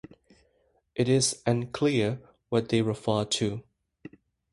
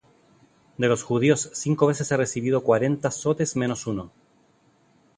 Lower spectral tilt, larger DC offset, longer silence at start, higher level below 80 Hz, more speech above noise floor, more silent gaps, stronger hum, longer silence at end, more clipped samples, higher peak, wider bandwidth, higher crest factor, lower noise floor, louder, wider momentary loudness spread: about the same, -5 dB/octave vs -5.5 dB/octave; neither; first, 0.95 s vs 0.8 s; about the same, -60 dBFS vs -60 dBFS; first, 43 dB vs 38 dB; neither; neither; second, 0.9 s vs 1.1 s; neither; second, -10 dBFS vs -4 dBFS; about the same, 11.5 kHz vs 11 kHz; about the same, 18 dB vs 20 dB; first, -69 dBFS vs -61 dBFS; second, -27 LUFS vs -24 LUFS; about the same, 9 LU vs 7 LU